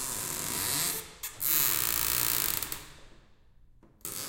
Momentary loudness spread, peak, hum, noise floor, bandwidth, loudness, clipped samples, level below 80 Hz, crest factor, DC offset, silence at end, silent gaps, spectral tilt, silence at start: 15 LU; -6 dBFS; none; -57 dBFS; 17.5 kHz; -28 LUFS; under 0.1%; -54 dBFS; 28 dB; under 0.1%; 0 s; none; -0.5 dB/octave; 0 s